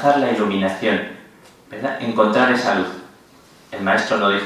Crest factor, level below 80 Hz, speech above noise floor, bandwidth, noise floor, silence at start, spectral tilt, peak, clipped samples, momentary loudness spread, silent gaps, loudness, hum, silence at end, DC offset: 18 dB; -60 dBFS; 30 dB; 14 kHz; -48 dBFS; 0 s; -5 dB/octave; -2 dBFS; under 0.1%; 16 LU; none; -19 LUFS; none; 0 s; under 0.1%